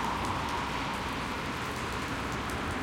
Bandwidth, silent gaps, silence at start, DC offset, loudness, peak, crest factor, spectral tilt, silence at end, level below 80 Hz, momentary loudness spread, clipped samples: 17 kHz; none; 0 s; under 0.1%; -33 LUFS; -16 dBFS; 18 dB; -4.5 dB/octave; 0 s; -46 dBFS; 2 LU; under 0.1%